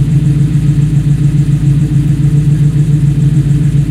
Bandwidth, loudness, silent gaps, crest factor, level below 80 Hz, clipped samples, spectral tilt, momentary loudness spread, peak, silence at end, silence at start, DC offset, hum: 10.5 kHz; -10 LUFS; none; 8 dB; -22 dBFS; under 0.1%; -8.5 dB/octave; 1 LU; 0 dBFS; 0 s; 0 s; under 0.1%; none